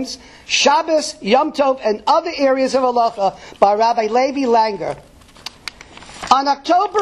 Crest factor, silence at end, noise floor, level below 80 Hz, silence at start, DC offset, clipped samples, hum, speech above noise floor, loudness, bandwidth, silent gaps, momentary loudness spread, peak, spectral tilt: 16 dB; 0 s; -39 dBFS; -52 dBFS; 0 s; under 0.1%; under 0.1%; none; 22 dB; -16 LUFS; 12 kHz; none; 18 LU; 0 dBFS; -3 dB/octave